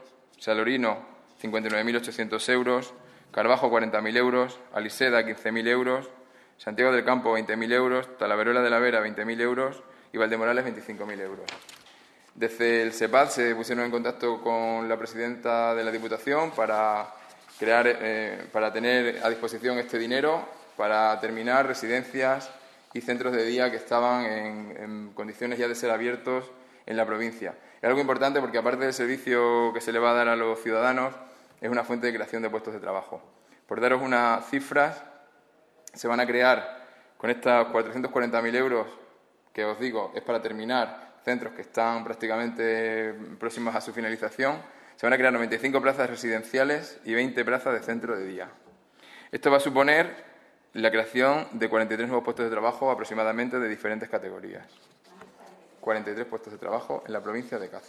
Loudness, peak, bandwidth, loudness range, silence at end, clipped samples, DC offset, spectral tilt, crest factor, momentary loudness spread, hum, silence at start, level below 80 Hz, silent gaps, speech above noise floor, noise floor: -26 LUFS; -6 dBFS; 14 kHz; 5 LU; 0.1 s; under 0.1%; under 0.1%; -4 dB/octave; 22 dB; 13 LU; none; 0 s; -78 dBFS; none; 34 dB; -61 dBFS